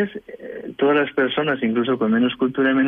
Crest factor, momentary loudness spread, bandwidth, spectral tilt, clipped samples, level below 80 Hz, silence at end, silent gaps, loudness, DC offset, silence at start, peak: 12 dB; 15 LU; 3.8 kHz; -8.5 dB/octave; under 0.1%; -60 dBFS; 0 s; none; -20 LUFS; under 0.1%; 0 s; -8 dBFS